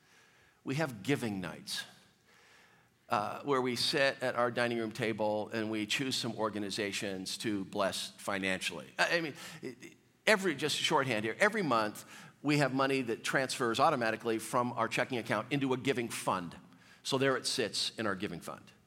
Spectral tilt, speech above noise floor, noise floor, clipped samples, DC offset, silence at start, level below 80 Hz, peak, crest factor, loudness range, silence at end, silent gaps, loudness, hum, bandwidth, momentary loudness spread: -4 dB/octave; 32 dB; -65 dBFS; under 0.1%; under 0.1%; 0.65 s; -78 dBFS; -12 dBFS; 22 dB; 4 LU; 0.15 s; none; -33 LUFS; none; 16.5 kHz; 10 LU